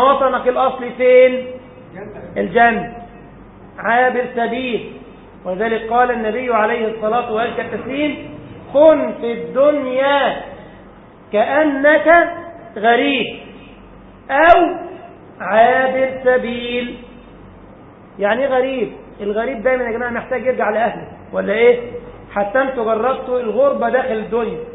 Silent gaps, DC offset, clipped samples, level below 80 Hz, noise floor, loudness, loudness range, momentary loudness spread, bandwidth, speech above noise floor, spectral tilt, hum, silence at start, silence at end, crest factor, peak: none; under 0.1%; under 0.1%; -48 dBFS; -41 dBFS; -16 LUFS; 4 LU; 19 LU; 4 kHz; 25 dB; -8.5 dB/octave; none; 0 s; 0 s; 16 dB; 0 dBFS